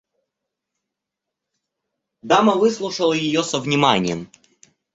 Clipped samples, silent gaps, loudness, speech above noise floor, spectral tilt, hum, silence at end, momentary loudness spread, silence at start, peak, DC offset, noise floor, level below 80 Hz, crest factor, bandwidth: under 0.1%; none; -18 LUFS; 65 dB; -4.5 dB/octave; none; 0.7 s; 5 LU; 2.25 s; -2 dBFS; under 0.1%; -83 dBFS; -60 dBFS; 20 dB; 8.2 kHz